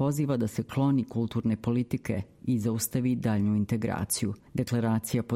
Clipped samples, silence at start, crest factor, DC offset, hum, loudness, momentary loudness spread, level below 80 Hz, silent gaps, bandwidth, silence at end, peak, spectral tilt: under 0.1%; 0 s; 14 dB; under 0.1%; none; -29 LUFS; 5 LU; -56 dBFS; none; 16 kHz; 0 s; -14 dBFS; -6 dB/octave